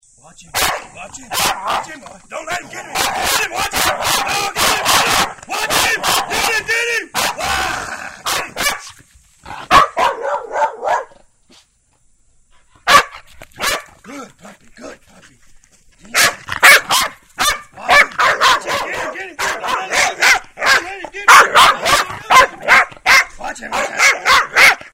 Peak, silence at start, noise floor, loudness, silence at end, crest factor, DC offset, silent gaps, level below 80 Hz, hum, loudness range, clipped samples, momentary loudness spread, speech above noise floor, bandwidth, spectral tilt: 0 dBFS; 0.55 s; -56 dBFS; -13 LUFS; 0.05 s; 16 dB; under 0.1%; none; -44 dBFS; none; 8 LU; 0.2%; 15 LU; 38 dB; over 20 kHz; -0.5 dB/octave